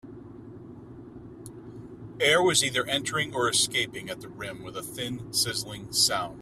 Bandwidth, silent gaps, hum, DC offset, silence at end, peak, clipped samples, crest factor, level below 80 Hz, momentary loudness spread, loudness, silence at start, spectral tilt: 16 kHz; none; none; under 0.1%; 0 s; -8 dBFS; under 0.1%; 22 dB; -58 dBFS; 23 LU; -25 LUFS; 0.05 s; -2 dB/octave